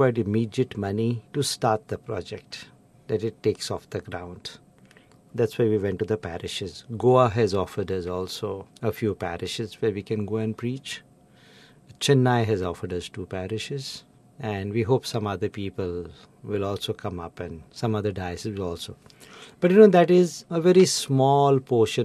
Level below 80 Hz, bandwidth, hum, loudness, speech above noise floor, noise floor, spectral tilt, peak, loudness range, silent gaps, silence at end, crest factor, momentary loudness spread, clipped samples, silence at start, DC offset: -58 dBFS; 13.5 kHz; none; -25 LUFS; 30 dB; -54 dBFS; -6 dB/octave; -4 dBFS; 10 LU; none; 0 s; 22 dB; 17 LU; under 0.1%; 0 s; under 0.1%